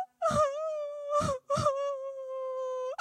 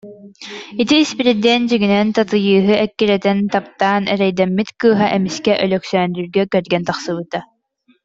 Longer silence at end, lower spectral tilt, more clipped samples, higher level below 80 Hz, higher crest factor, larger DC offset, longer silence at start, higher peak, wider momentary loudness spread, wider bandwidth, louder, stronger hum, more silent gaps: second, 0.05 s vs 0.6 s; about the same, -5 dB/octave vs -5.5 dB/octave; neither; about the same, -58 dBFS vs -56 dBFS; about the same, 16 dB vs 14 dB; neither; about the same, 0 s vs 0.05 s; second, -16 dBFS vs -2 dBFS; about the same, 9 LU vs 9 LU; first, 13 kHz vs 7.8 kHz; second, -32 LUFS vs -16 LUFS; neither; neither